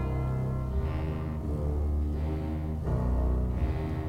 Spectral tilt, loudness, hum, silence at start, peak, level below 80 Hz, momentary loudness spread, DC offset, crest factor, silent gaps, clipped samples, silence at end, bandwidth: -9.5 dB/octave; -31 LUFS; none; 0 s; -18 dBFS; -32 dBFS; 4 LU; under 0.1%; 12 dB; none; under 0.1%; 0 s; 5.4 kHz